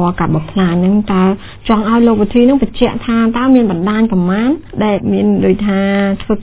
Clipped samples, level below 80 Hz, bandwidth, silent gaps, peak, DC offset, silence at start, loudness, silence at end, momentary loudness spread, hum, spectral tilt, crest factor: 0.1%; -34 dBFS; 4 kHz; none; 0 dBFS; under 0.1%; 0 s; -12 LUFS; 0 s; 5 LU; none; -11.5 dB/octave; 12 dB